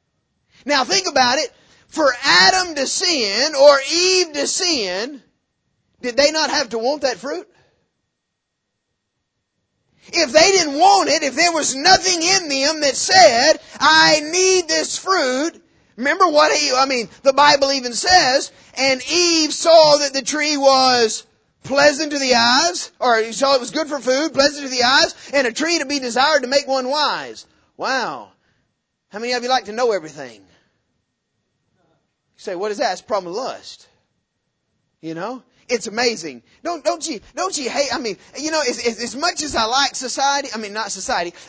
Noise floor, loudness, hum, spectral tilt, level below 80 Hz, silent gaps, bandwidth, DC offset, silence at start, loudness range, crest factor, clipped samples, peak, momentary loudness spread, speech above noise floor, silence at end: -76 dBFS; -16 LUFS; none; -1 dB/octave; -56 dBFS; none; 8 kHz; under 0.1%; 0.65 s; 13 LU; 18 dB; under 0.1%; 0 dBFS; 15 LU; 59 dB; 0.05 s